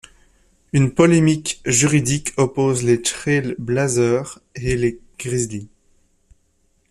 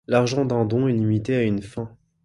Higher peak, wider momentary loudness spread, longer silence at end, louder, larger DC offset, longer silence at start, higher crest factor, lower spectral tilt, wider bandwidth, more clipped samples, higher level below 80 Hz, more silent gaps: first, -2 dBFS vs -6 dBFS; second, 10 LU vs 13 LU; first, 1.25 s vs 0.35 s; first, -19 LUFS vs -22 LUFS; neither; first, 0.75 s vs 0.1 s; about the same, 18 dB vs 18 dB; second, -5 dB/octave vs -7 dB/octave; first, 13 kHz vs 11.5 kHz; neither; first, -44 dBFS vs -52 dBFS; neither